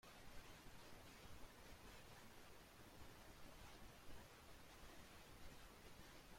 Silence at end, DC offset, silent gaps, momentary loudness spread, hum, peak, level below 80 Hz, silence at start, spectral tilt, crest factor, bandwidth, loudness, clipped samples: 0 s; under 0.1%; none; 1 LU; none; -44 dBFS; -68 dBFS; 0.05 s; -3.5 dB/octave; 16 dB; 16.5 kHz; -63 LUFS; under 0.1%